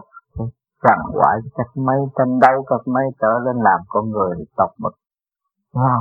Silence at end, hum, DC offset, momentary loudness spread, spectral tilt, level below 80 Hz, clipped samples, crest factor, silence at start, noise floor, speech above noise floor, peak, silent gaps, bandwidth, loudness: 0 s; none; under 0.1%; 14 LU; -9.5 dB/octave; -48 dBFS; under 0.1%; 18 dB; 0.15 s; -80 dBFS; 63 dB; 0 dBFS; none; 6.8 kHz; -18 LUFS